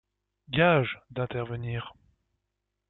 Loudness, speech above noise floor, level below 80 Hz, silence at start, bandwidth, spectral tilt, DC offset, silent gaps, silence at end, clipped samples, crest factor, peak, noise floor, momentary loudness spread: -28 LUFS; 55 dB; -58 dBFS; 0.5 s; 4.1 kHz; -4.5 dB/octave; under 0.1%; none; 0.95 s; under 0.1%; 20 dB; -10 dBFS; -82 dBFS; 14 LU